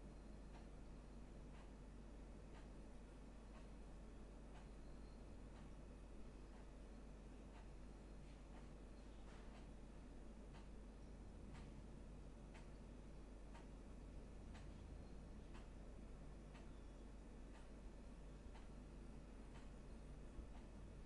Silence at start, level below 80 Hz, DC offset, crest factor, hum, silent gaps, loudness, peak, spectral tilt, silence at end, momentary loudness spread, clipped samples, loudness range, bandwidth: 0 s; -60 dBFS; under 0.1%; 16 dB; none; none; -61 LUFS; -42 dBFS; -6.5 dB/octave; 0 s; 2 LU; under 0.1%; 1 LU; 11 kHz